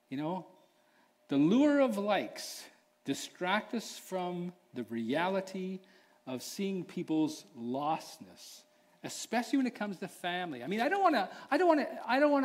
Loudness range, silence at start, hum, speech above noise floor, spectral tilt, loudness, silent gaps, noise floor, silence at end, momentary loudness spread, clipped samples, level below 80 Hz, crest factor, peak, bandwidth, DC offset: 6 LU; 0.1 s; none; 36 dB; -5 dB/octave; -33 LUFS; none; -68 dBFS; 0 s; 16 LU; under 0.1%; -84 dBFS; 18 dB; -14 dBFS; 16 kHz; under 0.1%